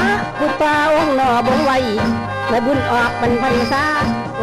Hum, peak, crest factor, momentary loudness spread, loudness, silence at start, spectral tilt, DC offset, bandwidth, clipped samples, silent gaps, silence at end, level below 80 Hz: none; -8 dBFS; 8 dB; 4 LU; -16 LUFS; 0 s; -5.5 dB/octave; under 0.1%; 13.5 kHz; under 0.1%; none; 0 s; -40 dBFS